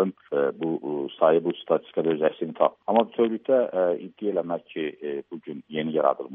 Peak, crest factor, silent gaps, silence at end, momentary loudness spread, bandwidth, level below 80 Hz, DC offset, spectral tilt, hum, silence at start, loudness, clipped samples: -6 dBFS; 20 dB; none; 0 s; 11 LU; 3.8 kHz; -76 dBFS; under 0.1%; -5 dB/octave; none; 0 s; -25 LUFS; under 0.1%